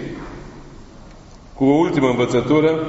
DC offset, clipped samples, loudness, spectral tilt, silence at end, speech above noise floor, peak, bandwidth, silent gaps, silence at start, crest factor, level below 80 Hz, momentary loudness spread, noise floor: under 0.1%; under 0.1%; -17 LUFS; -6 dB/octave; 0 s; 25 dB; -4 dBFS; 8 kHz; none; 0 s; 16 dB; -42 dBFS; 21 LU; -41 dBFS